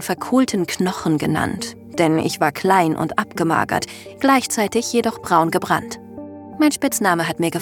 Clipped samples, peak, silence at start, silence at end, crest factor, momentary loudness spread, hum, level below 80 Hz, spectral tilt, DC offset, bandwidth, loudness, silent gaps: under 0.1%; -2 dBFS; 0 s; 0 s; 18 dB; 10 LU; none; -54 dBFS; -4.5 dB/octave; under 0.1%; 18 kHz; -19 LUFS; none